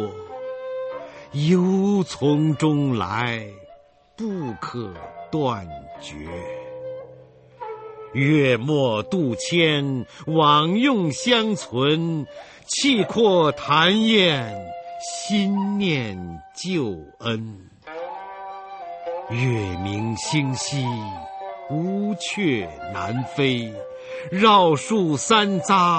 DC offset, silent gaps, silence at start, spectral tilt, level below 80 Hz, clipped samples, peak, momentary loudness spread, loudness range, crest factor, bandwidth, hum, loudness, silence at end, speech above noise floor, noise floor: under 0.1%; none; 0 s; -5 dB/octave; -56 dBFS; under 0.1%; -4 dBFS; 18 LU; 11 LU; 20 dB; 8.8 kHz; none; -21 LUFS; 0 s; 30 dB; -51 dBFS